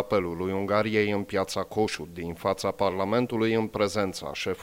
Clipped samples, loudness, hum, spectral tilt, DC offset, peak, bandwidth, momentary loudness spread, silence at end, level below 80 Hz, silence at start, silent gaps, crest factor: under 0.1%; -27 LUFS; none; -5.5 dB/octave; under 0.1%; -10 dBFS; 16.5 kHz; 6 LU; 0 s; -56 dBFS; 0 s; none; 18 dB